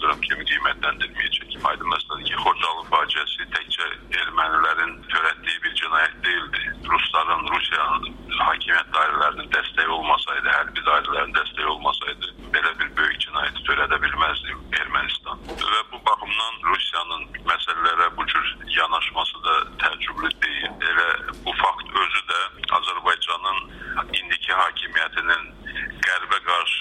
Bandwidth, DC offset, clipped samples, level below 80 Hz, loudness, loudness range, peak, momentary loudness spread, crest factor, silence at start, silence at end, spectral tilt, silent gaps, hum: 12.5 kHz; under 0.1%; under 0.1%; -46 dBFS; -22 LUFS; 2 LU; -6 dBFS; 6 LU; 18 dB; 0 s; 0 s; -2 dB/octave; none; none